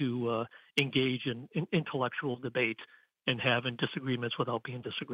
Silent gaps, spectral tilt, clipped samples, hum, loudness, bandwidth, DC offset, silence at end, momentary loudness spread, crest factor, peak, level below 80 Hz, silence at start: none; -6.5 dB/octave; under 0.1%; none; -33 LUFS; 12.5 kHz; under 0.1%; 0 s; 7 LU; 22 dB; -12 dBFS; -74 dBFS; 0 s